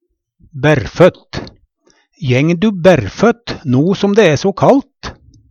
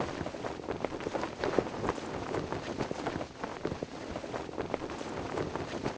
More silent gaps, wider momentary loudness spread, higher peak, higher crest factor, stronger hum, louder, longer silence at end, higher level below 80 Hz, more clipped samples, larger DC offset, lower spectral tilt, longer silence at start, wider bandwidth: neither; first, 17 LU vs 7 LU; first, 0 dBFS vs -10 dBFS; second, 14 dB vs 26 dB; neither; first, -12 LUFS vs -37 LUFS; first, 0.4 s vs 0 s; first, -42 dBFS vs -54 dBFS; neither; neither; about the same, -6.5 dB/octave vs -5.5 dB/octave; first, 0.55 s vs 0 s; first, 9.6 kHz vs 8 kHz